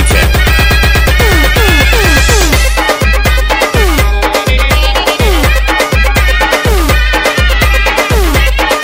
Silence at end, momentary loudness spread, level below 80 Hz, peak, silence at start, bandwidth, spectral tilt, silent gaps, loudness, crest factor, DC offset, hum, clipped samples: 0 s; 3 LU; -10 dBFS; 0 dBFS; 0 s; 16.5 kHz; -4 dB/octave; none; -9 LUFS; 8 dB; under 0.1%; none; 0.9%